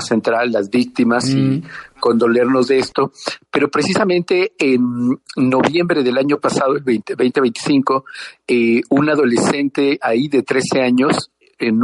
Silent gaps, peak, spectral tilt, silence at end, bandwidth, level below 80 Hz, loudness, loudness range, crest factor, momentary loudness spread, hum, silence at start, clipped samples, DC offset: none; 0 dBFS; -5.5 dB/octave; 0 s; 11.5 kHz; -58 dBFS; -16 LUFS; 1 LU; 14 dB; 6 LU; none; 0 s; under 0.1%; under 0.1%